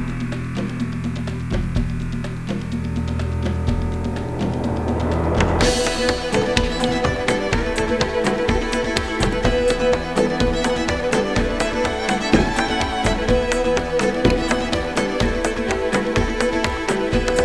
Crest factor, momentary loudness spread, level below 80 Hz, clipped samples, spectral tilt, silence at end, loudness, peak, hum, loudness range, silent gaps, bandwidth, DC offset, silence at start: 20 dB; 7 LU; -28 dBFS; under 0.1%; -5 dB/octave; 0 s; -21 LUFS; 0 dBFS; none; 5 LU; none; 11 kHz; 0.8%; 0 s